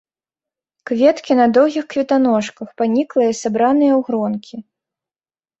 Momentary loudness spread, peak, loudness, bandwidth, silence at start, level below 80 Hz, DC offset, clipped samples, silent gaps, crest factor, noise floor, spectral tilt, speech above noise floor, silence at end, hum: 11 LU; -2 dBFS; -16 LUFS; 8 kHz; 0.85 s; -64 dBFS; under 0.1%; under 0.1%; none; 16 dB; under -90 dBFS; -5.5 dB/octave; over 74 dB; 1 s; none